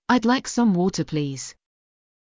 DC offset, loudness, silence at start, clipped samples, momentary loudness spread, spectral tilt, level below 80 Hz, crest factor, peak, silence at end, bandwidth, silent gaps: under 0.1%; -22 LUFS; 0.1 s; under 0.1%; 13 LU; -5 dB/octave; -56 dBFS; 16 dB; -6 dBFS; 0.85 s; 7.6 kHz; none